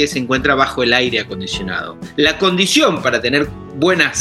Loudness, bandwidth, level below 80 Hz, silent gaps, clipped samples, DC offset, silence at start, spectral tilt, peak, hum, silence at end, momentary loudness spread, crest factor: -15 LUFS; 12.5 kHz; -40 dBFS; none; under 0.1%; 0.1%; 0 s; -3.5 dB/octave; 0 dBFS; none; 0 s; 10 LU; 16 dB